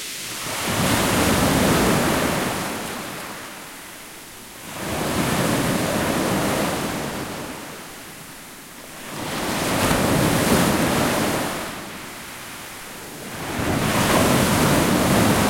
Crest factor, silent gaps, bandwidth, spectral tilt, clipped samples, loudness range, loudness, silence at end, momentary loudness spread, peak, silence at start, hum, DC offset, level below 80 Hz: 18 dB; none; 16.5 kHz; -4 dB/octave; under 0.1%; 6 LU; -21 LUFS; 0 s; 18 LU; -4 dBFS; 0 s; none; under 0.1%; -42 dBFS